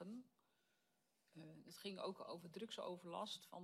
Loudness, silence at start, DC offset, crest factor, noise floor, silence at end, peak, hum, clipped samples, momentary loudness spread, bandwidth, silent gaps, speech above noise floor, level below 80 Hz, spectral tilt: -52 LUFS; 0 s; under 0.1%; 18 dB; -85 dBFS; 0 s; -36 dBFS; none; under 0.1%; 12 LU; 15 kHz; none; 33 dB; under -90 dBFS; -4.5 dB/octave